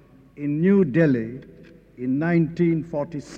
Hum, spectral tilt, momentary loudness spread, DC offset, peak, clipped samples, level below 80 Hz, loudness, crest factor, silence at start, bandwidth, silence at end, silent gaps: none; -9.5 dB/octave; 14 LU; under 0.1%; -8 dBFS; under 0.1%; -56 dBFS; -22 LUFS; 16 dB; 0.35 s; 7.6 kHz; 0 s; none